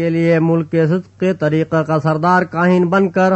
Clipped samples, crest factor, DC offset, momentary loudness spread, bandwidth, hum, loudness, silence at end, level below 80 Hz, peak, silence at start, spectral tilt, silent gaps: under 0.1%; 12 dB; under 0.1%; 4 LU; 8.2 kHz; none; -15 LUFS; 0 s; -56 dBFS; -2 dBFS; 0 s; -8.5 dB/octave; none